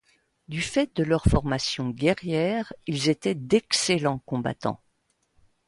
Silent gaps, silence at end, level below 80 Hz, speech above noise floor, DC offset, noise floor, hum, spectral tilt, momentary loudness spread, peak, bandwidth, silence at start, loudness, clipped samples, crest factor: none; 0.9 s; -40 dBFS; 46 dB; under 0.1%; -71 dBFS; none; -5 dB/octave; 9 LU; -6 dBFS; 11.5 kHz; 0.5 s; -25 LUFS; under 0.1%; 20 dB